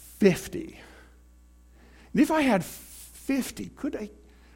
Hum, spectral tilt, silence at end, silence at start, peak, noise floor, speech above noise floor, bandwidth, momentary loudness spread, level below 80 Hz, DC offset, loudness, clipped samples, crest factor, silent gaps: 60 Hz at -50 dBFS; -5.5 dB/octave; 0.45 s; 0 s; -8 dBFS; -55 dBFS; 29 dB; 17 kHz; 19 LU; -54 dBFS; under 0.1%; -27 LUFS; under 0.1%; 22 dB; none